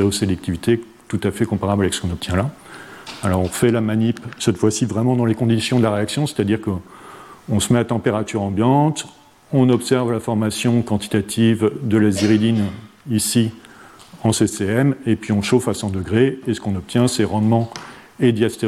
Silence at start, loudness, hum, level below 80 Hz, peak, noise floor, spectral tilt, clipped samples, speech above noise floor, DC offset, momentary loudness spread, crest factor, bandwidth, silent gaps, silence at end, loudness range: 0 s; -19 LUFS; none; -48 dBFS; -4 dBFS; -43 dBFS; -5.5 dB/octave; under 0.1%; 25 dB; under 0.1%; 10 LU; 16 dB; 15 kHz; none; 0 s; 2 LU